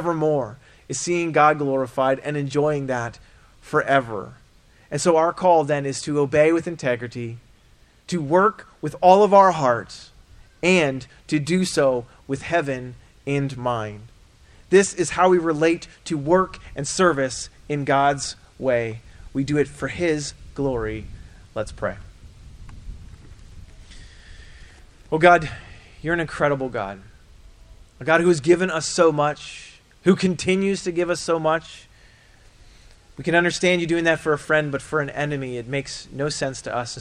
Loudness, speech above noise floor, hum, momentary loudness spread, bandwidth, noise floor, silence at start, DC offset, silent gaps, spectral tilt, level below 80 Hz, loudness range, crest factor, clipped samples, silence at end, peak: -21 LUFS; 33 dB; none; 15 LU; 11.5 kHz; -54 dBFS; 0 s; under 0.1%; none; -5 dB/octave; -48 dBFS; 6 LU; 22 dB; under 0.1%; 0 s; 0 dBFS